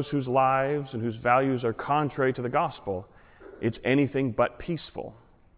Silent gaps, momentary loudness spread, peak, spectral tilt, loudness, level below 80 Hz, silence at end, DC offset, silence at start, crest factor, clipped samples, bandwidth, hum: none; 11 LU; -8 dBFS; -10.5 dB/octave; -27 LUFS; -56 dBFS; 0.45 s; under 0.1%; 0 s; 20 dB; under 0.1%; 4 kHz; none